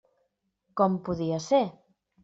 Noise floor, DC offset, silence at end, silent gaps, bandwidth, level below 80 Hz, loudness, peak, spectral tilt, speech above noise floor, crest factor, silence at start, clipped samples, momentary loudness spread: -76 dBFS; under 0.1%; 0.5 s; none; 7.8 kHz; -64 dBFS; -27 LUFS; -10 dBFS; -6.5 dB/octave; 50 dB; 20 dB; 0.75 s; under 0.1%; 8 LU